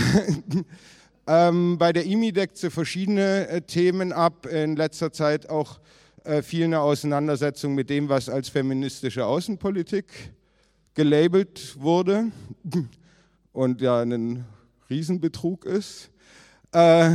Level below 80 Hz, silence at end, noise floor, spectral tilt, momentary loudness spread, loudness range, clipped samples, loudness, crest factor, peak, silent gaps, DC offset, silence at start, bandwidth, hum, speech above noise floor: -58 dBFS; 0 s; -63 dBFS; -6.5 dB/octave; 12 LU; 4 LU; under 0.1%; -24 LUFS; 20 dB; -4 dBFS; none; under 0.1%; 0 s; 14 kHz; none; 41 dB